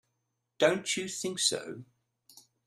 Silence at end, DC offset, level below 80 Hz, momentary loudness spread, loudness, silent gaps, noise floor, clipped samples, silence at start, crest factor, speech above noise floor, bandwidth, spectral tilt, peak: 0.25 s; under 0.1%; -76 dBFS; 15 LU; -30 LUFS; none; -82 dBFS; under 0.1%; 0.6 s; 24 dB; 51 dB; 15 kHz; -2 dB/octave; -10 dBFS